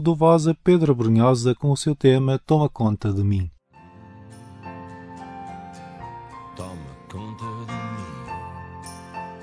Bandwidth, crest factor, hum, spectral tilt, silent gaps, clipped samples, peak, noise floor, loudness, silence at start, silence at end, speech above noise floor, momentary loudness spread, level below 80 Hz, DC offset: 11 kHz; 18 dB; none; -7.5 dB/octave; none; under 0.1%; -4 dBFS; -48 dBFS; -20 LUFS; 0 s; 0 s; 30 dB; 21 LU; -50 dBFS; under 0.1%